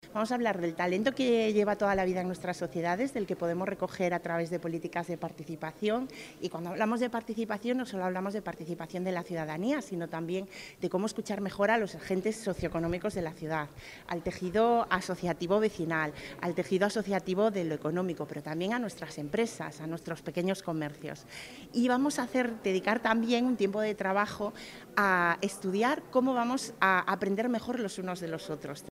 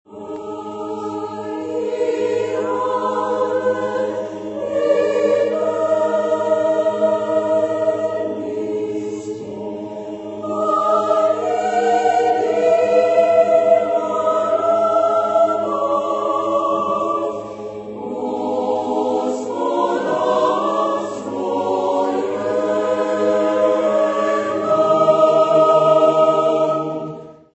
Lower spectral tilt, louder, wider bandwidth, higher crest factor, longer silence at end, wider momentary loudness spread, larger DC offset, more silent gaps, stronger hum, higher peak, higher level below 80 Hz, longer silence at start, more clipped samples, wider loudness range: about the same, -5.5 dB/octave vs -5.5 dB/octave; second, -32 LUFS vs -18 LUFS; first, 16 kHz vs 8.4 kHz; first, 22 dB vs 16 dB; second, 0 s vs 0.2 s; about the same, 11 LU vs 13 LU; neither; neither; neither; second, -10 dBFS vs -2 dBFS; about the same, -62 dBFS vs -64 dBFS; about the same, 0.05 s vs 0.1 s; neither; about the same, 5 LU vs 6 LU